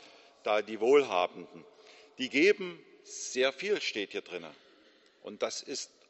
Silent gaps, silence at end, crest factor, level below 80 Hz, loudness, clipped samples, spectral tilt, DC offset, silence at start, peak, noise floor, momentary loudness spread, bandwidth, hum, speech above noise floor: none; 0.25 s; 20 dB; -82 dBFS; -30 LUFS; under 0.1%; -2.5 dB/octave; under 0.1%; 0.45 s; -12 dBFS; -63 dBFS; 23 LU; 8.2 kHz; none; 32 dB